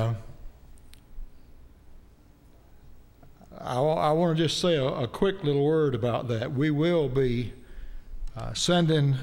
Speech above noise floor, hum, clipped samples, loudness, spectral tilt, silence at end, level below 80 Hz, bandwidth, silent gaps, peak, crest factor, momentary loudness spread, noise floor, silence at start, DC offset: 29 dB; none; under 0.1%; -26 LUFS; -6 dB/octave; 0 s; -44 dBFS; 16 kHz; none; -10 dBFS; 18 dB; 16 LU; -54 dBFS; 0 s; under 0.1%